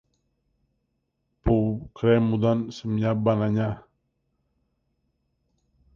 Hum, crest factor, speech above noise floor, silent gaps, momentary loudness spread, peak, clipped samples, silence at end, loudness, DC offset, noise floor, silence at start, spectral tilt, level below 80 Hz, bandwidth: none; 18 dB; 53 dB; none; 9 LU; -8 dBFS; under 0.1%; 2.15 s; -24 LUFS; under 0.1%; -76 dBFS; 1.45 s; -9 dB/octave; -44 dBFS; 7 kHz